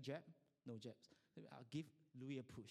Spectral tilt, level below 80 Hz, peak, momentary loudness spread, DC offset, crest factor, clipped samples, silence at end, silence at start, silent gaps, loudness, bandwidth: -6.5 dB/octave; -86 dBFS; -36 dBFS; 11 LU; under 0.1%; 20 dB; under 0.1%; 0 s; 0 s; none; -56 LUFS; 14 kHz